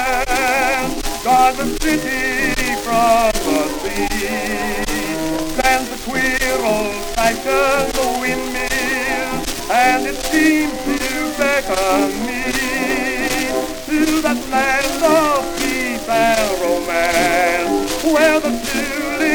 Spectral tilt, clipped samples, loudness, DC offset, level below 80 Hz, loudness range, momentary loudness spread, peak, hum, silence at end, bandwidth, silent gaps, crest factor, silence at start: -3 dB/octave; under 0.1%; -17 LUFS; under 0.1%; -32 dBFS; 2 LU; 6 LU; -2 dBFS; none; 0 s; over 20 kHz; none; 16 dB; 0 s